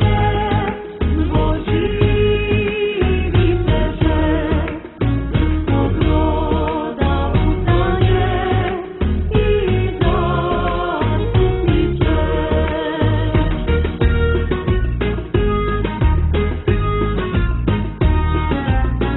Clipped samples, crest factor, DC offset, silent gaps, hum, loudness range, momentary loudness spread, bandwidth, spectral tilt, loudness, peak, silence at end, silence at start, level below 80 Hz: under 0.1%; 14 dB; under 0.1%; none; none; 1 LU; 4 LU; 4.1 kHz; -12 dB/octave; -18 LUFS; -2 dBFS; 0 s; 0 s; -20 dBFS